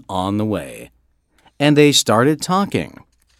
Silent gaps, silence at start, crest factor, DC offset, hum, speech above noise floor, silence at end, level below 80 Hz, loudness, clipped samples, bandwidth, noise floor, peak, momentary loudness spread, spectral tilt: none; 0.1 s; 18 dB; under 0.1%; none; 43 dB; 0.55 s; -54 dBFS; -16 LUFS; under 0.1%; 16 kHz; -60 dBFS; 0 dBFS; 14 LU; -4.5 dB/octave